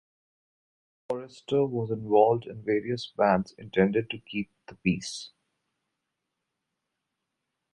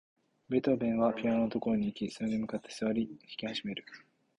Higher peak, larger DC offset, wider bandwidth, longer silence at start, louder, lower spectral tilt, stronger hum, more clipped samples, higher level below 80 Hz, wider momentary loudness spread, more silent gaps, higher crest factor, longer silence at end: first, -8 dBFS vs -16 dBFS; neither; about the same, 11.5 kHz vs 11 kHz; first, 1.1 s vs 0.5 s; first, -28 LUFS vs -33 LUFS; about the same, -6 dB/octave vs -6.5 dB/octave; neither; neither; about the same, -62 dBFS vs -66 dBFS; about the same, 13 LU vs 11 LU; neither; about the same, 22 dB vs 18 dB; first, 2.45 s vs 0.4 s